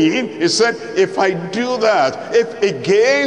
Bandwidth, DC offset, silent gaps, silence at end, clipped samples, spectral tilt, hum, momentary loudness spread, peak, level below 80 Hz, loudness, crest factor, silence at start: 10.5 kHz; 0.1%; none; 0 s; under 0.1%; -4 dB/octave; none; 4 LU; -4 dBFS; -62 dBFS; -16 LUFS; 12 dB; 0 s